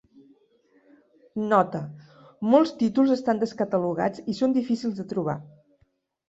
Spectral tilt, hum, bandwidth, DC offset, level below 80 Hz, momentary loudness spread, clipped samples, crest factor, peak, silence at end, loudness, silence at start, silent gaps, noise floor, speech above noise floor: -7.5 dB/octave; none; 8 kHz; under 0.1%; -68 dBFS; 11 LU; under 0.1%; 20 dB; -6 dBFS; 0.8 s; -25 LUFS; 1.35 s; none; -68 dBFS; 45 dB